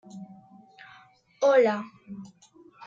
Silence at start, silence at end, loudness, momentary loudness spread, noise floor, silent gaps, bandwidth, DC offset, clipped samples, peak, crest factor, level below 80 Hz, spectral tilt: 0.15 s; 0.6 s; -23 LUFS; 24 LU; -56 dBFS; none; 7.6 kHz; under 0.1%; under 0.1%; -10 dBFS; 20 dB; -78 dBFS; -5 dB/octave